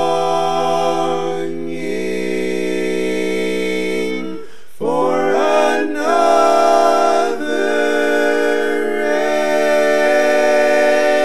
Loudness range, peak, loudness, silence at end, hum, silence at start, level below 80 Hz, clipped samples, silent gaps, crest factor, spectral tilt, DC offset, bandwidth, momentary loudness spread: 6 LU; -2 dBFS; -16 LUFS; 0 s; none; 0 s; -62 dBFS; under 0.1%; none; 14 dB; -4 dB/octave; 5%; 13.5 kHz; 9 LU